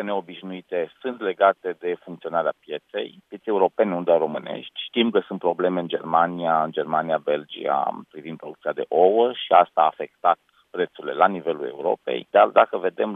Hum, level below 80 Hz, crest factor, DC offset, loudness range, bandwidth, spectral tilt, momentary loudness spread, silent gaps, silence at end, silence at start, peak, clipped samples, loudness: none; -80 dBFS; 22 dB; under 0.1%; 4 LU; 3.9 kHz; -8 dB/octave; 14 LU; none; 0 s; 0 s; 0 dBFS; under 0.1%; -23 LUFS